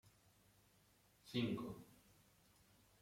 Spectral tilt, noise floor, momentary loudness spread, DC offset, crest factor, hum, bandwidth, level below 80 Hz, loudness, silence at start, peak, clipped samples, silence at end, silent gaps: -6 dB/octave; -74 dBFS; 23 LU; under 0.1%; 22 dB; none; 16.5 kHz; -78 dBFS; -45 LUFS; 0.05 s; -28 dBFS; under 0.1%; 1.05 s; none